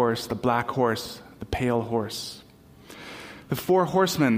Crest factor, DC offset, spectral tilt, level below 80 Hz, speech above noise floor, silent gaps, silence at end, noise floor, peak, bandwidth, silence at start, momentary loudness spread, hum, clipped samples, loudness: 18 dB; under 0.1%; -5.5 dB/octave; -50 dBFS; 24 dB; none; 0 s; -49 dBFS; -8 dBFS; 16 kHz; 0 s; 19 LU; none; under 0.1%; -25 LUFS